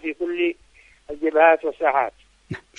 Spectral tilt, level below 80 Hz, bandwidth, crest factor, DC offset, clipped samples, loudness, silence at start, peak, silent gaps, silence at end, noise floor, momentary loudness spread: -6.5 dB/octave; -58 dBFS; 7.4 kHz; 20 dB; under 0.1%; under 0.1%; -21 LUFS; 0.05 s; -2 dBFS; none; 0.2 s; -54 dBFS; 21 LU